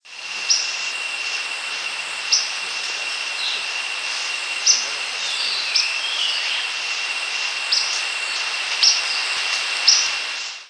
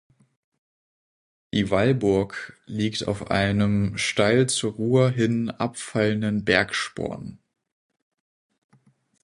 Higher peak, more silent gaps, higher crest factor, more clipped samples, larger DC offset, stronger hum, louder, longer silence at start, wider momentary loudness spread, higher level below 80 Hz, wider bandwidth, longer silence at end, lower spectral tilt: about the same, 0 dBFS vs -2 dBFS; neither; about the same, 22 dB vs 22 dB; neither; neither; neither; first, -19 LUFS vs -23 LUFS; second, 0.05 s vs 1.55 s; about the same, 9 LU vs 11 LU; second, -78 dBFS vs -50 dBFS; about the same, 11 kHz vs 11.5 kHz; second, 0 s vs 1.85 s; second, 4 dB/octave vs -5 dB/octave